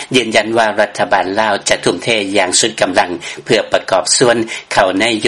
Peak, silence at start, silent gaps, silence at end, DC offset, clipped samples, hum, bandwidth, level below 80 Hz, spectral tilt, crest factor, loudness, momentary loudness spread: 0 dBFS; 0 s; none; 0 s; 0.2%; under 0.1%; none; 12 kHz; -50 dBFS; -2.5 dB/octave; 14 dB; -13 LUFS; 5 LU